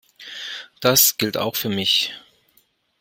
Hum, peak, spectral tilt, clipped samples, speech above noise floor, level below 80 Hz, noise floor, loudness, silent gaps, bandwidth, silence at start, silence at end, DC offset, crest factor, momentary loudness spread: none; 0 dBFS; -2 dB/octave; under 0.1%; 43 dB; -62 dBFS; -62 dBFS; -18 LUFS; none; 16.5 kHz; 0.2 s; 0.8 s; under 0.1%; 22 dB; 18 LU